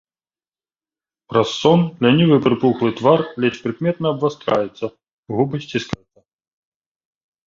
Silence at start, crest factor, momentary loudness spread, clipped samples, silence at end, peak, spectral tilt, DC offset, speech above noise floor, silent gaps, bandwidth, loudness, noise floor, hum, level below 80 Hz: 1.3 s; 20 dB; 12 LU; under 0.1%; 1.5 s; 0 dBFS; -7 dB/octave; under 0.1%; over 73 dB; 5.13-5.23 s; 7.6 kHz; -18 LUFS; under -90 dBFS; none; -56 dBFS